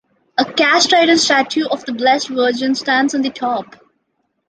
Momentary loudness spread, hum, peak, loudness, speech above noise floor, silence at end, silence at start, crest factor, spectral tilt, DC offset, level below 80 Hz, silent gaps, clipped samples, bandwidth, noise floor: 10 LU; none; 0 dBFS; -15 LUFS; 53 dB; 0.85 s; 0.4 s; 16 dB; -2 dB/octave; under 0.1%; -64 dBFS; none; under 0.1%; 10 kHz; -69 dBFS